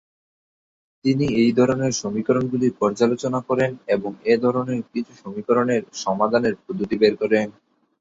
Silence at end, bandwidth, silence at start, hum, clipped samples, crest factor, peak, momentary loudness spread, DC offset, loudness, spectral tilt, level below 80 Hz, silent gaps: 0.5 s; 7.8 kHz; 1.05 s; none; under 0.1%; 18 dB; -2 dBFS; 8 LU; under 0.1%; -21 LUFS; -6 dB/octave; -56 dBFS; none